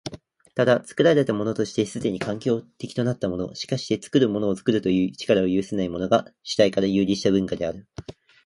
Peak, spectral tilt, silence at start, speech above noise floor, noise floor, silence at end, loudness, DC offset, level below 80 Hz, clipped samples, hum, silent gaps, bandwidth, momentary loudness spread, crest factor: -4 dBFS; -6 dB/octave; 0.05 s; 19 dB; -42 dBFS; 0.35 s; -23 LUFS; under 0.1%; -54 dBFS; under 0.1%; none; none; 11.5 kHz; 9 LU; 18 dB